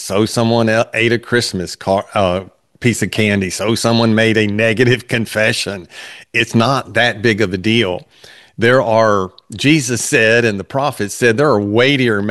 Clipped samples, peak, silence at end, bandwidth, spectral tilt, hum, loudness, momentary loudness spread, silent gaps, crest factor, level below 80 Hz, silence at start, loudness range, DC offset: under 0.1%; 0 dBFS; 0 s; 12.5 kHz; -4.5 dB/octave; none; -14 LUFS; 7 LU; none; 14 dB; -52 dBFS; 0 s; 2 LU; 0.2%